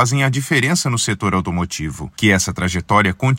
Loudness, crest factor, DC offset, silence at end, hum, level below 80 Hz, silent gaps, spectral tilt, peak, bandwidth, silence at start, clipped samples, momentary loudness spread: -17 LUFS; 16 dB; under 0.1%; 0 s; none; -44 dBFS; none; -4.5 dB/octave; 0 dBFS; 16.5 kHz; 0 s; under 0.1%; 7 LU